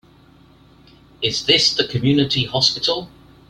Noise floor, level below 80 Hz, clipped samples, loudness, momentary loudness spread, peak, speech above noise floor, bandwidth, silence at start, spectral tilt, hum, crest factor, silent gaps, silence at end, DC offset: -49 dBFS; -50 dBFS; under 0.1%; -17 LUFS; 8 LU; -2 dBFS; 31 dB; 13 kHz; 1.2 s; -4 dB/octave; none; 20 dB; none; 0.4 s; under 0.1%